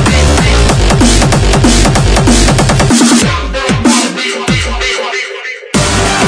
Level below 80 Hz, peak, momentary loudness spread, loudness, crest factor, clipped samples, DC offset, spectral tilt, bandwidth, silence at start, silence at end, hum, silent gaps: -14 dBFS; 0 dBFS; 7 LU; -9 LUFS; 8 dB; 0.3%; under 0.1%; -4 dB/octave; 11 kHz; 0 s; 0 s; none; none